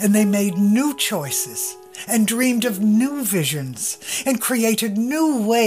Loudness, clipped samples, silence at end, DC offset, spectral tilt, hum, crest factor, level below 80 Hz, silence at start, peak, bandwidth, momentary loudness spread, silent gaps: -19 LUFS; under 0.1%; 0 s; under 0.1%; -4 dB/octave; none; 14 dB; -68 dBFS; 0 s; -6 dBFS; 16 kHz; 7 LU; none